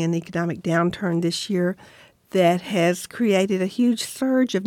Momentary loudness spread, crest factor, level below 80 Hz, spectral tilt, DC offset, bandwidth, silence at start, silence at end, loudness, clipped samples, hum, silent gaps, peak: 6 LU; 14 dB; -62 dBFS; -5.5 dB/octave; under 0.1%; 16.5 kHz; 0 s; 0 s; -22 LUFS; under 0.1%; none; none; -8 dBFS